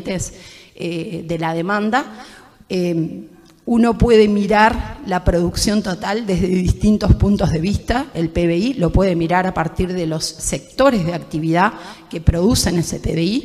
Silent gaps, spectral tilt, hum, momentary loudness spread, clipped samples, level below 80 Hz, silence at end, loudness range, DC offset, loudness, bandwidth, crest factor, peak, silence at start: none; -5.5 dB/octave; none; 11 LU; under 0.1%; -28 dBFS; 0 s; 4 LU; under 0.1%; -18 LUFS; 15.5 kHz; 16 dB; 0 dBFS; 0 s